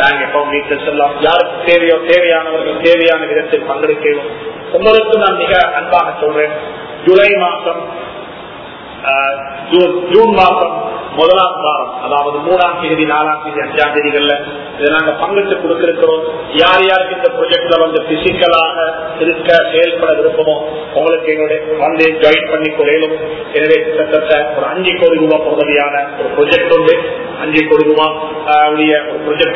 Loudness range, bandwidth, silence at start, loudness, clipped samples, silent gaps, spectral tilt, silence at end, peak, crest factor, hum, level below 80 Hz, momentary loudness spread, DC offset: 2 LU; 6 kHz; 0 s; -11 LUFS; 0.3%; none; -6.5 dB/octave; 0 s; 0 dBFS; 12 dB; none; -46 dBFS; 8 LU; under 0.1%